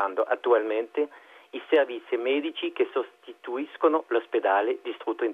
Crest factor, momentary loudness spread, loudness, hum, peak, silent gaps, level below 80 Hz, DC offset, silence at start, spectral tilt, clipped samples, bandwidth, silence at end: 18 dB; 11 LU; -27 LUFS; none; -8 dBFS; none; -84 dBFS; under 0.1%; 0 s; -4.5 dB/octave; under 0.1%; 4.1 kHz; 0 s